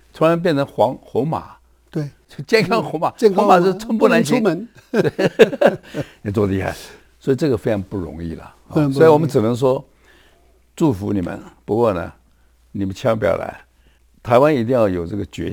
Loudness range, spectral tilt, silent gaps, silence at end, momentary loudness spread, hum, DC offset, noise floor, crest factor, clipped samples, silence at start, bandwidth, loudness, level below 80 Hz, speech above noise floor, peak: 6 LU; -6.5 dB/octave; none; 0 s; 15 LU; none; under 0.1%; -54 dBFS; 18 dB; under 0.1%; 0.15 s; over 20 kHz; -18 LUFS; -48 dBFS; 37 dB; 0 dBFS